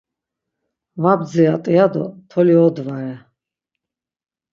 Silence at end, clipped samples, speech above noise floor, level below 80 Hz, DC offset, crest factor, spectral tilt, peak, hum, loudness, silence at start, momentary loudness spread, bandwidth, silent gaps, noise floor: 1.35 s; under 0.1%; 71 dB; -66 dBFS; under 0.1%; 18 dB; -9 dB/octave; 0 dBFS; none; -16 LUFS; 0.95 s; 14 LU; 7.4 kHz; none; -87 dBFS